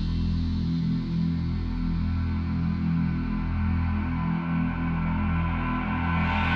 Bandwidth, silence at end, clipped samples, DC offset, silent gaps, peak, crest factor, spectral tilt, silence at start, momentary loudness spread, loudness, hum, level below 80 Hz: 5.8 kHz; 0 s; under 0.1%; under 0.1%; none; -14 dBFS; 12 dB; -9 dB/octave; 0 s; 2 LU; -27 LUFS; none; -34 dBFS